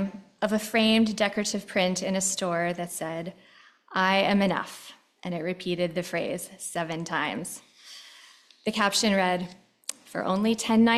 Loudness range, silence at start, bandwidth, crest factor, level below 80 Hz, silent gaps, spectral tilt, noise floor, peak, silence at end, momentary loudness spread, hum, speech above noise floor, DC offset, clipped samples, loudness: 5 LU; 0 s; 14 kHz; 20 dB; -66 dBFS; none; -4 dB/octave; -54 dBFS; -8 dBFS; 0 s; 17 LU; none; 28 dB; under 0.1%; under 0.1%; -27 LUFS